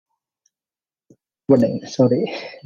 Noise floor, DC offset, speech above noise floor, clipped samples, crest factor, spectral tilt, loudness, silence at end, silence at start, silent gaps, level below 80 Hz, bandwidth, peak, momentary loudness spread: under -90 dBFS; under 0.1%; over 72 dB; under 0.1%; 18 dB; -7.5 dB/octave; -19 LUFS; 0.1 s; 1.5 s; none; -60 dBFS; 7.4 kHz; -2 dBFS; 10 LU